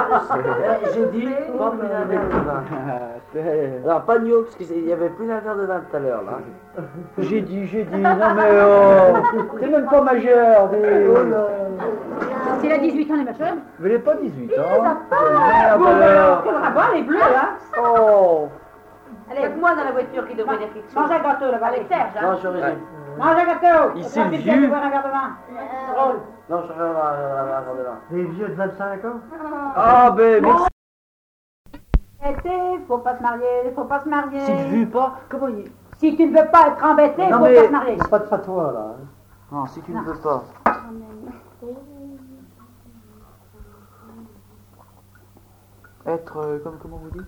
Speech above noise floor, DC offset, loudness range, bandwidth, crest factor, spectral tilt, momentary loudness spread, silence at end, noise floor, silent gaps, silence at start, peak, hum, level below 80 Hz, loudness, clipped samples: 33 dB; under 0.1%; 11 LU; 8.2 kHz; 16 dB; -8 dB/octave; 17 LU; 0 s; -50 dBFS; 30.72-31.65 s; 0 s; -2 dBFS; none; -40 dBFS; -18 LUFS; under 0.1%